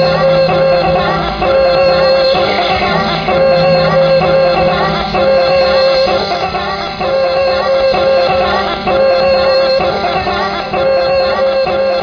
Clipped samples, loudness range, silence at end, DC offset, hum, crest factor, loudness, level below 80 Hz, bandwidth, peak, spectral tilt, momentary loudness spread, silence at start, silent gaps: under 0.1%; 2 LU; 0 s; under 0.1%; none; 10 dB; -11 LUFS; -34 dBFS; 5.4 kHz; 0 dBFS; -6 dB/octave; 5 LU; 0 s; none